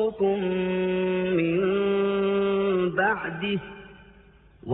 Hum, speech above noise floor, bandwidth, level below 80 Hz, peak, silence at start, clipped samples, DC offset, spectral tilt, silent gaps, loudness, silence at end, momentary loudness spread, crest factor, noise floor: none; 27 dB; 4 kHz; -56 dBFS; -10 dBFS; 0 s; under 0.1%; under 0.1%; -11 dB/octave; none; -25 LUFS; 0 s; 6 LU; 16 dB; -54 dBFS